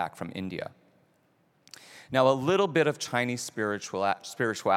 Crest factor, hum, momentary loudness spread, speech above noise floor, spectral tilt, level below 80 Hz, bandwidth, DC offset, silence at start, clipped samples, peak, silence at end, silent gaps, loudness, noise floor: 22 dB; none; 14 LU; 40 dB; -4.5 dB/octave; -74 dBFS; 16 kHz; under 0.1%; 0 s; under 0.1%; -8 dBFS; 0 s; none; -28 LUFS; -68 dBFS